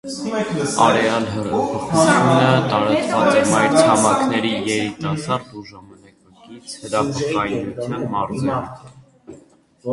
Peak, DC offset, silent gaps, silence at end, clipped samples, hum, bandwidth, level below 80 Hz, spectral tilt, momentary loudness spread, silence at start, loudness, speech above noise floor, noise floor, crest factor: 0 dBFS; under 0.1%; none; 0 s; under 0.1%; none; 11.5 kHz; -52 dBFS; -5 dB/octave; 12 LU; 0.05 s; -18 LUFS; 32 dB; -50 dBFS; 18 dB